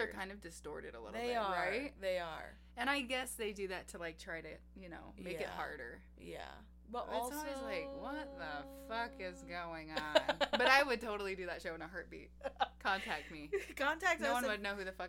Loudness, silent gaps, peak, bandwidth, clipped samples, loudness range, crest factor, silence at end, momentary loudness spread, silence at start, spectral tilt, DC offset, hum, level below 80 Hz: -39 LUFS; none; -14 dBFS; 16.5 kHz; under 0.1%; 10 LU; 26 dB; 0 s; 16 LU; 0 s; -3 dB/octave; under 0.1%; 60 Hz at -60 dBFS; -60 dBFS